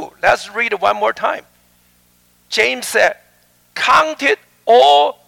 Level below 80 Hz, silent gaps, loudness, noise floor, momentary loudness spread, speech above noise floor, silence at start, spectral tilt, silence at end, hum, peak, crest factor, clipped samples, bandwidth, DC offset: -56 dBFS; none; -14 LUFS; -55 dBFS; 11 LU; 41 dB; 0 s; -1.5 dB/octave; 0.15 s; 60 Hz at -60 dBFS; -2 dBFS; 14 dB; under 0.1%; 17.5 kHz; under 0.1%